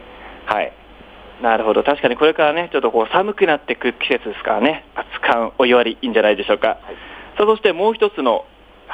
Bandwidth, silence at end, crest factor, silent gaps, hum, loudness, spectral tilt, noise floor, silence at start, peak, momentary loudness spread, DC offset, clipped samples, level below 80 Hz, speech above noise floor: 8 kHz; 0 s; 16 dB; none; none; -17 LUFS; -6 dB/octave; -41 dBFS; 0 s; -2 dBFS; 12 LU; under 0.1%; under 0.1%; -50 dBFS; 24 dB